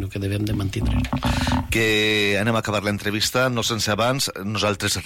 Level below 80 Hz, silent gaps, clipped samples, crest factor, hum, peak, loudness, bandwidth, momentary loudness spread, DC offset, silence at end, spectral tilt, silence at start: -34 dBFS; none; under 0.1%; 12 dB; none; -10 dBFS; -21 LUFS; 16.5 kHz; 6 LU; under 0.1%; 0 s; -4 dB/octave; 0 s